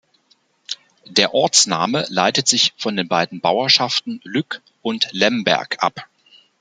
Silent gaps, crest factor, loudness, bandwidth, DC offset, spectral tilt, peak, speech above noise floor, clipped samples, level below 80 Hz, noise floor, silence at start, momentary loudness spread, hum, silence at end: none; 20 dB; -17 LUFS; 13 kHz; under 0.1%; -2 dB/octave; 0 dBFS; 42 dB; under 0.1%; -64 dBFS; -60 dBFS; 0.7 s; 15 LU; none; 0.55 s